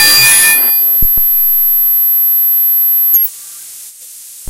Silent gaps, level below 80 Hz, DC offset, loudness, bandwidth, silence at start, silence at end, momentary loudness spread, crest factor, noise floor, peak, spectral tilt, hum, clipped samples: none; -34 dBFS; under 0.1%; -6 LUFS; over 20 kHz; 0 s; 0 s; 8 LU; 10 dB; -32 dBFS; 0 dBFS; 1 dB/octave; none; 0.3%